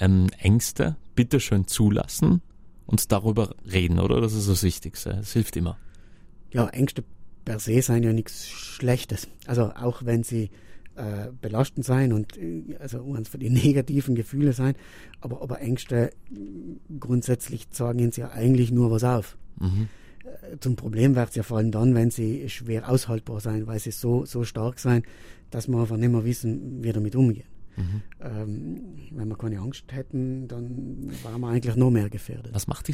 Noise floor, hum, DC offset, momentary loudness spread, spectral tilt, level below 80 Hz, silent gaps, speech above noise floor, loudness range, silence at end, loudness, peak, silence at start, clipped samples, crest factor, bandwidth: -46 dBFS; none; under 0.1%; 14 LU; -6.5 dB/octave; -44 dBFS; none; 22 dB; 5 LU; 0 s; -25 LUFS; -4 dBFS; 0 s; under 0.1%; 22 dB; 16 kHz